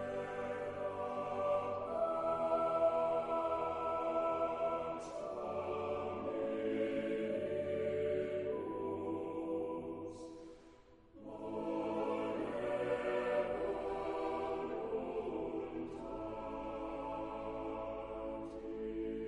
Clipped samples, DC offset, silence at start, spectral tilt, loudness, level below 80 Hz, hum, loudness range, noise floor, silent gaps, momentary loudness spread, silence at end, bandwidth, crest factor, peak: under 0.1%; under 0.1%; 0 s; -7 dB/octave; -39 LUFS; -64 dBFS; none; 7 LU; -61 dBFS; none; 8 LU; 0 s; 11 kHz; 16 dB; -22 dBFS